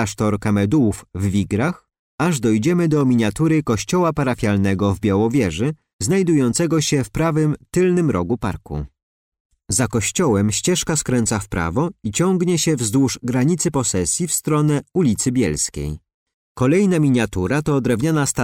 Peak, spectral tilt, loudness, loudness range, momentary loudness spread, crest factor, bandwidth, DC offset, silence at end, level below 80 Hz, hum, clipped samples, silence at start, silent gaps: -8 dBFS; -5.5 dB/octave; -19 LUFS; 2 LU; 6 LU; 12 dB; 16.5 kHz; under 0.1%; 0 s; -42 dBFS; none; under 0.1%; 0 s; 1.99-2.18 s, 5.93-5.99 s, 9.03-9.32 s, 9.40-9.50 s, 16.14-16.26 s, 16.34-16.55 s